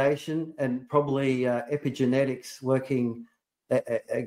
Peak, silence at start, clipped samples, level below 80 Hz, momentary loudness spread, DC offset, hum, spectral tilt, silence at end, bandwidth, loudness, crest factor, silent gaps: -8 dBFS; 0 s; under 0.1%; -70 dBFS; 6 LU; under 0.1%; none; -7 dB/octave; 0 s; 15 kHz; -28 LUFS; 18 dB; none